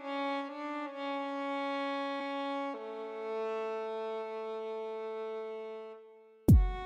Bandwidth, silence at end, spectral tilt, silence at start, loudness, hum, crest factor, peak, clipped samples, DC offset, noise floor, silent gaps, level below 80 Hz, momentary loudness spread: 13.5 kHz; 0 s; -7.5 dB/octave; 0 s; -36 LUFS; none; 20 dB; -14 dBFS; under 0.1%; under 0.1%; -57 dBFS; none; -40 dBFS; 8 LU